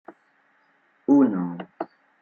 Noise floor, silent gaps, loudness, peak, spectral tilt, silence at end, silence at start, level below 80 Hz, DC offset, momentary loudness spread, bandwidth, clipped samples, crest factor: -64 dBFS; none; -22 LUFS; -8 dBFS; -10 dB/octave; 0.35 s; 0.1 s; -72 dBFS; under 0.1%; 18 LU; 3.1 kHz; under 0.1%; 18 dB